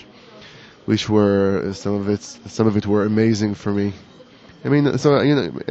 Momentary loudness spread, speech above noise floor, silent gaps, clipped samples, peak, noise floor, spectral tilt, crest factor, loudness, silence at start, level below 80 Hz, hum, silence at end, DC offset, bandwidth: 10 LU; 27 dB; none; under 0.1%; -2 dBFS; -45 dBFS; -6.5 dB/octave; 16 dB; -19 LUFS; 0.35 s; -54 dBFS; none; 0 s; under 0.1%; 8.2 kHz